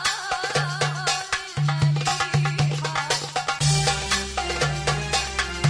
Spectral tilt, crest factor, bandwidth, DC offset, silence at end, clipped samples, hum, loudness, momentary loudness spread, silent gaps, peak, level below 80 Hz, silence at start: -3.5 dB/octave; 16 dB; 10.5 kHz; under 0.1%; 0 s; under 0.1%; none; -23 LUFS; 4 LU; none; -8 dBFS; -40 dBFS; 0 s